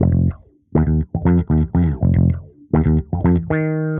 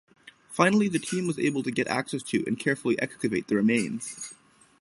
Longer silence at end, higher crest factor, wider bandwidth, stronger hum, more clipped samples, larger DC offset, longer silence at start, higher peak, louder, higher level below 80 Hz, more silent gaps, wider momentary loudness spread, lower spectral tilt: second, 0 s vs 0.45 s; second, 14 dB vs 24 dB; second, 3.5 kHz vs 11.5 kHz; neither; neither; neither; second, 0 s vs 0.25 s; about the same, -4 dBFS vs -4 dBFS; first, -18 LUFS vs -27 LUFS; first, -26 dBFS vs -66 dBFS; neither; second, 4 LU vs 12 LU; first, -11.5 dB/octave vs -5 dB/octave